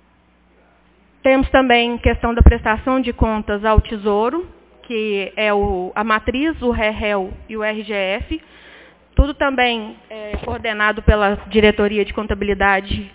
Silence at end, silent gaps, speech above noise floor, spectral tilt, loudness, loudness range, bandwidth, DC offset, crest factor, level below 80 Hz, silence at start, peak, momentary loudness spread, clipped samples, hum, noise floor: 0.05 s; none; 38 dB; -10 dB/octave; -18 LUFS; 5 LU; 4 kHz; under 0.1%; 18 dB; -24 dBFS; 1.25 s; 0 dBFS; 11 LU; under 0.1%; none; -55 dBFS